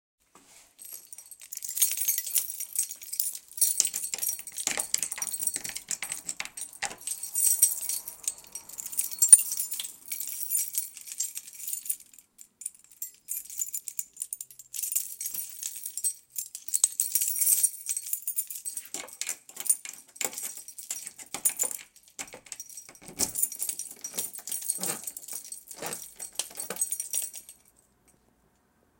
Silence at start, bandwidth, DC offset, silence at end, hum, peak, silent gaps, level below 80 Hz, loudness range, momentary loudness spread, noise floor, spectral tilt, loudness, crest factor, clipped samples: 0.5 s; 17.5 kHz; under 0.1%; 1.45 s; none; 0 dBFS; none; -72 dBFS; 11 LU; 17 LU; -68 dBFS; 1.5 dB/octave; -28 LUFS; 30 dB; under 0.1%